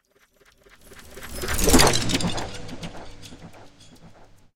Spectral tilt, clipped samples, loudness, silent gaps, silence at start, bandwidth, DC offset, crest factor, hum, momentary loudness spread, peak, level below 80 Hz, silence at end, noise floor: -3 dB/octave; under 0.1%; -21 LUFS; none; 0 s; 17 kHz; under 0.1%; 24 dB; none; 26 LU; 0 dBFS; -34 dBFS; 0 s; -59 dBFS